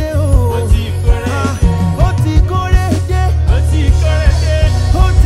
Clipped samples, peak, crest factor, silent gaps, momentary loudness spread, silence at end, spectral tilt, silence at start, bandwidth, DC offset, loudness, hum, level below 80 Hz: under 0.1%; 0 dBFS; 10 dB; none; 3 LU; 0 s; -6.5 dB/octave; 0 s; 13 kHz; under 0.1%; -13 LUFS; none; -14 dBFS